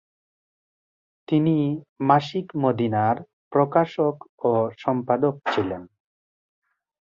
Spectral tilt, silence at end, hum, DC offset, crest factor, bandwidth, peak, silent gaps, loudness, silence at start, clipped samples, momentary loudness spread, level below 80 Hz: -8.5 dB/octave; 1.15 s; none; under 0.1%; 22 dB; 7.4 kHz; -2 dBFS; 1.89-1.96 s, 3.33-3.51 s, 4.29-4.38 s; -23 LUFS; 1.3 s; under 0.1%; 7 LU; -62 dBFS